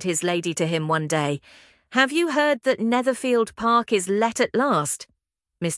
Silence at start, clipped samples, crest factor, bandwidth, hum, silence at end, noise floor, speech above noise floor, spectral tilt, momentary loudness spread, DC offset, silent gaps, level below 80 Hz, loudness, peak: 0 s; under 0.1%; 20 dB; 12 kHz; none; 0 s; -53 dBFS; 31 dB; -4 dB/octave; 6 LU; under 0.1%; none; -64 dBFS; -22 LUFS; -2 dBFS